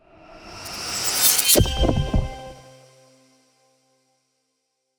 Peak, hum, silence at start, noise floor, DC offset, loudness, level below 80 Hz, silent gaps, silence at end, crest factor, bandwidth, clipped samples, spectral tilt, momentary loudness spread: -2 dBFS; none; 0.3 s; -75 dBFS; under 0.1%; -19 LUFS; -32 dBFS; none; 2.35 s; 22 dB; over 20 kHz; under 0.1%; -3 dB/octave; 23 LU